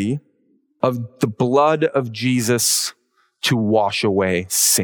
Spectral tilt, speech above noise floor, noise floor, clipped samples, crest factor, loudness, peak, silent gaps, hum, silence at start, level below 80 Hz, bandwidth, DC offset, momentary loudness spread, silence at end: -3.5 dB/octave; 44 dB; -62 dBFS; under 0.1%; 18 dB; -19 LUFS; -2 dBFS; none; none; 0 s; -62 dBFS; over 20 kHz; under 0.1%; 8 LU; 0 s